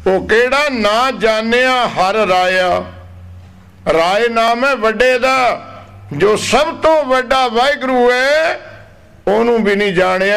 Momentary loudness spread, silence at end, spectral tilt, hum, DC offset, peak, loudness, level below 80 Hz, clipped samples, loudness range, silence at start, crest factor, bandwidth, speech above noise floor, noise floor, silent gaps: 5 LU; 0 s; -4 dB/octave; none; 0.3%; -2 dBFS; -13 LUFS; -40 dBFS; under 0.1%; 1 LU; 0 s; 12 dB; 15 kHz; 28 dB; -41 dBFS; none